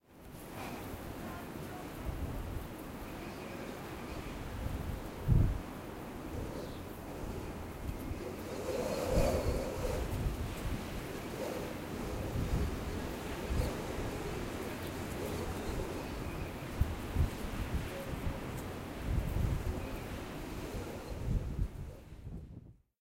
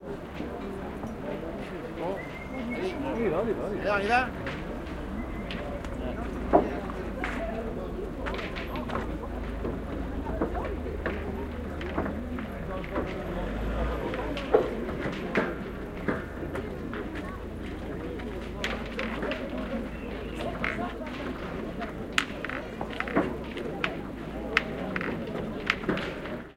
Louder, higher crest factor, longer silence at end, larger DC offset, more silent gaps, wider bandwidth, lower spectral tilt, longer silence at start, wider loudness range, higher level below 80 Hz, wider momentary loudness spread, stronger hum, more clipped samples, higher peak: second, -39 LUFS vs -32 LUFS; second, 22 dB vs 28 dB; first, 0.3 s vs 0 s; neither; neither; about the same, 16 kHz vs 16.5 kHz; about the same, -6 dB/octave vs -6 dB/octave; about the same, 0.1 s vs 0 s; about the same, 6 LU vs 4 LU; about the same, -42 dBFS vs -40 dBFS; about the same, 9 LU vs 8 LU; neither; neither; second, -16 dBFS vs -4 dBFS